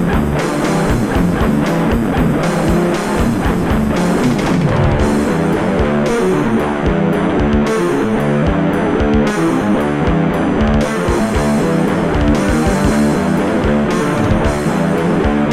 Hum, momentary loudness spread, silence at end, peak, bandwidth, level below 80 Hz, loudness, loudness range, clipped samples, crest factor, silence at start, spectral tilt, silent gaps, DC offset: none; 2 LU; 0 s; -2 dBFS; 15 kHz; -24 dBFS; -14 LUFS; 0 LU; under 0.1%; 12 dB; 0 s; -6.5 dB/octave; none; under 0.1%